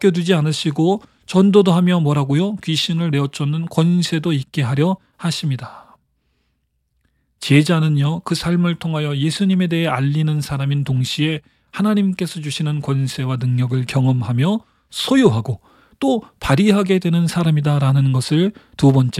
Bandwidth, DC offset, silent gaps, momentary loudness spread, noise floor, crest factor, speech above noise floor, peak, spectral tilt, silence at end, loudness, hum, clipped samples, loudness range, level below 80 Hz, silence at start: 14 kHz; under 0.1%; none; 8 LU; -68 dBFS; 16 dB; 51 dB; -2 dBFS; -6.5 dB/octave; 0 s; -18 LUFS; none; under 0.1%; 4 LU; -50 dBFS; 0 s